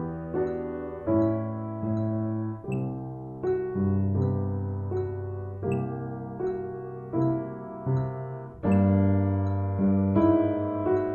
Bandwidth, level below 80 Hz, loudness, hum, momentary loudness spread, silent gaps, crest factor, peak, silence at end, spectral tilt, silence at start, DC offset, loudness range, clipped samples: 4.2 kHz; -54 dBFS; -28 LUFS; none; 12 LU; none; 16 dB; -10 dBFS; 0 s; -11.5 dB/octave; 0 s; under 0.1%; 6 LU; under 0.1%